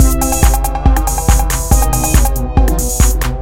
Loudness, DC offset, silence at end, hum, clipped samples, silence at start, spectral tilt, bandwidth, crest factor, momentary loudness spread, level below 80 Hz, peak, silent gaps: -13 LUFS; under 0.1%; 0 s; none; 0.2%; 0 s; -4.5 dB/octave; 17 kHz; 10 dB; 2 LU; -12 dBFS; 0 dBFS; none